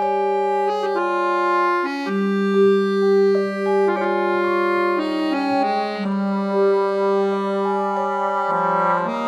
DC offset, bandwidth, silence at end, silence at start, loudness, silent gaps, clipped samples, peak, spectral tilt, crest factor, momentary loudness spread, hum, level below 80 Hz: under 0.1%; 10 kHz; 0 s; 0 s; -20 LUFS; none; under 0.1%; -6 dBFS; -7 dB/octave; 12 dB; 5 LU; none; -68 dBFS